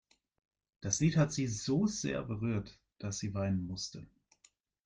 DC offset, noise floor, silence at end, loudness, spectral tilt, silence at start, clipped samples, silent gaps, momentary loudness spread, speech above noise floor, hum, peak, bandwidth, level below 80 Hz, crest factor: under 0.1%; -70 dBFS; 0.8 s; -35 LUFS; -5 dB/octave; 0.8 s; under 0.1%; none; 14 LU; 36 dB; none; -16 dBFS; 10 kHz; -62 dBFS; 20 dB